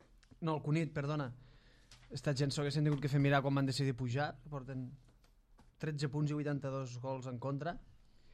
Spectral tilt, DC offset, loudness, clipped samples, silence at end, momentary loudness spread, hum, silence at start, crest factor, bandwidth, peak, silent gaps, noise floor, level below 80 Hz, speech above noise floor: -6.5 dB/octave; under 0.1%; -37 LUFS; under 0.1%; 0 s; 13 LU; none; 0.4 s; 18 dB; 11 kHz; -20 dBFS; none; -66 dBFS; -64 dBFS; 29 dB